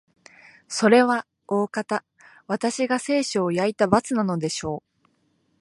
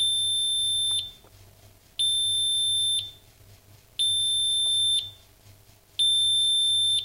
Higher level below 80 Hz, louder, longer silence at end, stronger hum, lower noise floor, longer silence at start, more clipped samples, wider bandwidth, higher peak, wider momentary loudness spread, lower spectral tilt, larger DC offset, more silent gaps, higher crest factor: about the same, -60 dBFS vs -60 dBFS; about the same, -23 LUFS vs -22 LUFS; first, 0.8 s vs 0 s; neither; first, -67 dBFS vs -54 dBFS; first, 0.7 s vs 0 s; neither; second, 11.5 kHz vs 16 kHz; first, -2 dBFS vs -16 dBFS; second, 12 LU vs 16 LU; first, -4.5 dB/octave vs 1.5 dB/octave; neither; neither; first, 22 dB vs 10 dB